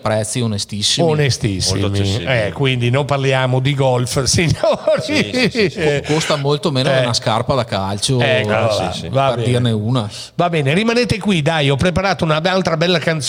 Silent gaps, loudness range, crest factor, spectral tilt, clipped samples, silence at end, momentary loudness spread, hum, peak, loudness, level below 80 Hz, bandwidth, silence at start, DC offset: none; 1 LU; 16 dB; -5 dB/octave; under 0.1%; 0 s; 4 LU; none; 0 dBFS; -16 LUFS; -42 dBFS; 16 kHz; 0.05 s; under 0.1%